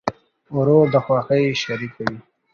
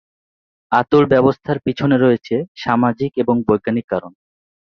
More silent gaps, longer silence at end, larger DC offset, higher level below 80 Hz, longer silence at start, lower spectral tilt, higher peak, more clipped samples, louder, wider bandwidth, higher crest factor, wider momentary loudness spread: second, none vs 2.48-2.55 s, 3.84-3.88 s; second, 0.35 s vs 0.6 s; neither; second, -56 dBFS vs -50 dBFS; second, 0.05 s vs 0.7 s; second, -6.5 dB/octave vs -8.5 dB/octave; about the same, -2 dBFS vs 0 dBFS; neither; about the same, -19 LUFS vs -17 LUFS; about the same, 7 kHz vs 6.4 kHz; about the same, 18 dB vs 16 dB; first, 12 LU vs 8 LU